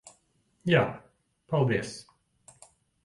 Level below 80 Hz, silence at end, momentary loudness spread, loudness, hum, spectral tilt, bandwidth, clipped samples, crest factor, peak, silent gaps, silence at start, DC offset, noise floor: -62 dBFS; 1.05 s; 18 LU; -28 LUFS; none; -6 dB/octave; 11.5 kHz; under 0.1%; 22 dB; -10 dBFS; none; 0.65 s; under 0.1%; -70 dBFS